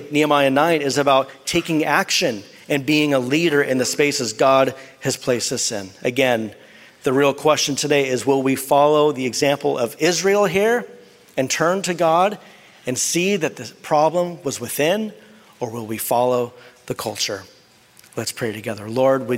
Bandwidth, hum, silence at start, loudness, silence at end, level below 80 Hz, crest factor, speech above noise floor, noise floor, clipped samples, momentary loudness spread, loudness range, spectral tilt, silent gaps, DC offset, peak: 16 kHz; none; 0 s; -19 LUFS; 0 s; -60 dBFS; 18 dB; 32 dB; -51 dBFS; under 0.1%; 11 LU; 5 LU; -3.5 dB/octave; none; under 0.1%; -2 dBFS